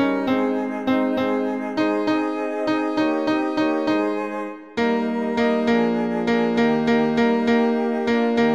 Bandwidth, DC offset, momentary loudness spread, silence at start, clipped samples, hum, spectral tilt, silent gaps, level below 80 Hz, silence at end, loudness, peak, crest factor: 7.8 kHz; 0.2%; 5 LU; 0 s; under 0.1%; none; -6.5 dB/octave; none; -60 dBFS; 0 s; -21 LUFS; -8 dBFS; 12 dB